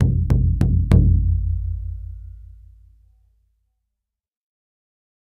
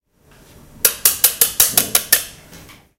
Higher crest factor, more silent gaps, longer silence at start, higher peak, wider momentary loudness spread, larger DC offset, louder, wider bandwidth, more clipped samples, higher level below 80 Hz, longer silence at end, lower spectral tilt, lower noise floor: about the same, 20 dB vs 20 dB; neither; second, 0 s vs 0.85 s; about the same, 0 dBFS vs 0 dBFS; first, 21 LU vs 5 LU; neither; second, -19 LUFS vs -13 LUFS; second, 4.5 kHz vs over 20 kHz; second, under 0.1% vs 0.2%; first, -26 dBFS vs -48 dBFS; first, 2.95 s vs 0.4 s; first, -10 dB/octave vs 0.5 dB/octave; first, -82 dBFS vs -50 dBFS